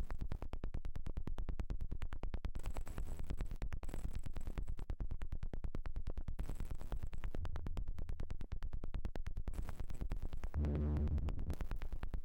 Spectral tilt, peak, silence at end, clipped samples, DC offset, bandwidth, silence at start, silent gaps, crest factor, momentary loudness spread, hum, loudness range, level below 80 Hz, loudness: -7.5 dB/octave; -32 dBFS; 0 s; under 0.1%; under 0.1%; 8.4 kHz; 0 s; none; 6 dB; 9 LU; none; 5 LU; -42 dBFS; -47 LUFS